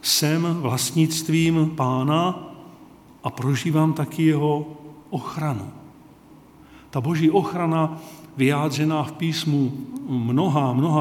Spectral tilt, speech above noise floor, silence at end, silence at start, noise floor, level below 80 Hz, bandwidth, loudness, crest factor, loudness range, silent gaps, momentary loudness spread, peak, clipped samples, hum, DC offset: -5.5 dB/octave; 27 dB; 0 s; 0.05 s; -48 dBFS; -60 dBFS; 18 kHz; -22 LUFS; 18 dB; 3 LU; none; 13 LU; -6 dBFS; under 0.1%; none; under 0.1%